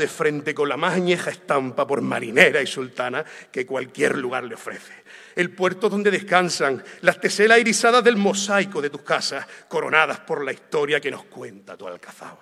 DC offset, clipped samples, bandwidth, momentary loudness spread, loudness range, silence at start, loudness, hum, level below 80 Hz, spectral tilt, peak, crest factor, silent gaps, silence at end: under 0.1%; under 0.1%; 14.5 kHz; 19 LU; 6 LU; 0 s; -21 LUFS; none; -74 dBFS; -3.5 dB/octave; 0 dBFS; 22 dB; none; 0.05 s